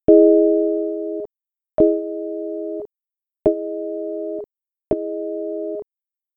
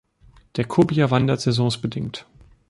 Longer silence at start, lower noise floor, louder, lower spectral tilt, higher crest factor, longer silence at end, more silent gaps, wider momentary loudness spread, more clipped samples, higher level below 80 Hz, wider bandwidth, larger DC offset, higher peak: second, 0.1 s vs 0.55 s; first, -90 dBFS vs -53 dBFS; about the same, -21 LUFS vs -21 LUFS; first, -12 dB/octave vs -6.5 dB/octave; about the same, 20 dB vs 18 dB; about the same, 0.55 s vs 0.5 s; neither; first, 17 LU vs 13 LU; neither; about the same, -52 dBFS vs -50 dBFS; second, 2.1 kHz vs 11.5 kHz; neither; first, 0 dBFS vs -4 dBFS